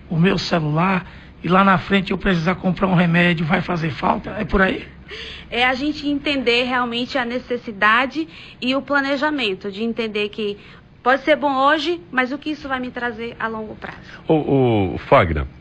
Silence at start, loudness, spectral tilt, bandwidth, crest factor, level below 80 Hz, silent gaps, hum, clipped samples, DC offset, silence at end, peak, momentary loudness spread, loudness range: 0 s; -19 LUFS; -6.5 dB/octave; 8.6 kHz; 16 dB; -40 dBFS; none; none; under 0.1%; under 0.1%; 0 s; -2 dBFS; 12 LU; 4 LU